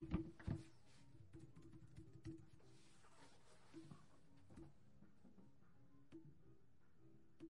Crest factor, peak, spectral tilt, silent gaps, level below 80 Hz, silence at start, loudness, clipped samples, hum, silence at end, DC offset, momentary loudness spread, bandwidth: 28 dB; -30 dBFS; -7.5 dB/octave; none; -68 dBFS; 0 s; -58 LUFS; under 0.1%; none; 0 s; under 0.1%; 18 LU; 11 kHz